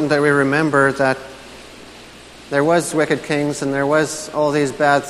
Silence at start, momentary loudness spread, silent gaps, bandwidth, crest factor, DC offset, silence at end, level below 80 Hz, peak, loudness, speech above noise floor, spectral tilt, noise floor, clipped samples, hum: 0 s; 22 LU; none; 13.5 kHz; 18 dB; under 0.1%; 0 s; -52 dBFS; 0 dBFS; -17 LUFS; 23 dB; -5 dB/octave; -40 dBFS; under 0.1%; none